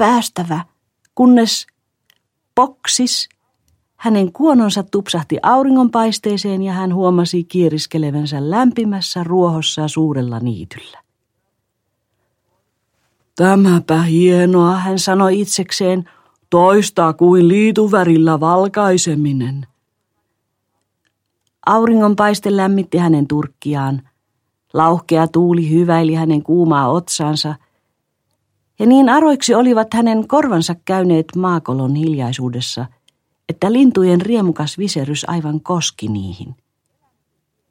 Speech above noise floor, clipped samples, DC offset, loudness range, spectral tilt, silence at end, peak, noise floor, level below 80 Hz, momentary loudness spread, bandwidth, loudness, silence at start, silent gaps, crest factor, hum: 58 dB; under 0.1%; under 0.1%; 6 LU; -5.5 dB/octave; 1.2 s; 0 dBFS; -71 dBFS; -58 dBFS; 11 LU; 16 kHz; -14 LUFS; 0 s; none; 14 dB; none